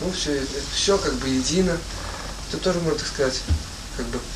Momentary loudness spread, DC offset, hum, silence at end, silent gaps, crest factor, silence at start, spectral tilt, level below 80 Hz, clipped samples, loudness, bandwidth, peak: 11 LU; under 0.1%; none; 0 s; none; 16 dB; 0 s; -4 dB/octave; -34 dBFS; under 0.1%; -24 LUFS; 15 kHz; -8 dBFS